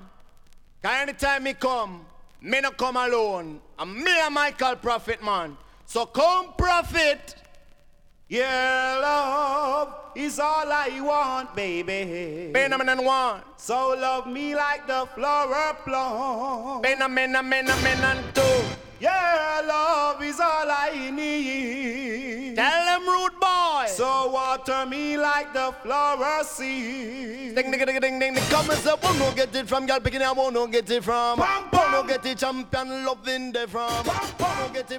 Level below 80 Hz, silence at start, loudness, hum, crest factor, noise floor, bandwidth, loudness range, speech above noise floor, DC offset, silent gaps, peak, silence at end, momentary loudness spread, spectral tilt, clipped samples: -48 dBFS; 0 s; -24 LUFS; none; 18 dB; -53 dBFS; 18 kHz; 3 LU; 28 dB; under 0.1%; none; -8 dBFS; 0 s; 8 LU; -3.5 dB/octave; under 0.1%